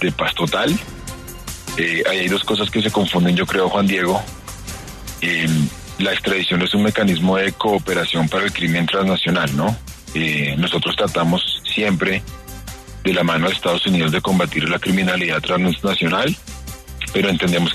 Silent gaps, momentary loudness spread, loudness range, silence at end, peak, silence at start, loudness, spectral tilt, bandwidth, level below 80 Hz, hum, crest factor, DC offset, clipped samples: none; 15 LU; 2 LU; 0 s; -4 dBFS; 0 s; -18 LUFS; -5 dB/octave; 13.5 kHz; -40 dBFS; none; 14 dB; under 0.1%; under 0.1%